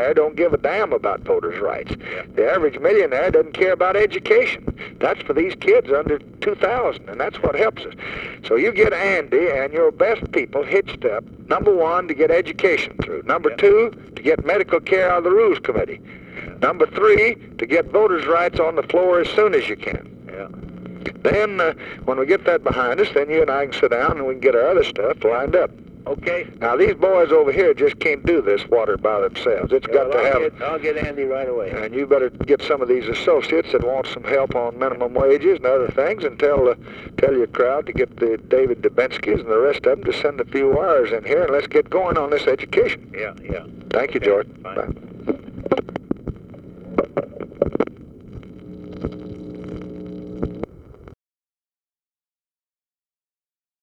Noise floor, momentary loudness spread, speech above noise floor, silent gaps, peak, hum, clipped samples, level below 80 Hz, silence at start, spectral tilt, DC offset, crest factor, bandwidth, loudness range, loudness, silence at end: under -90 dBFS; 13 LU; over 71 dB; none; 0 dBFS; none; under 0.1%; -44 dBFS; 0 s; -6.5 dB/octave; under 0.1%; 18 dB; 8 kHz; 9 LU; -19 LUFS; 2.75 s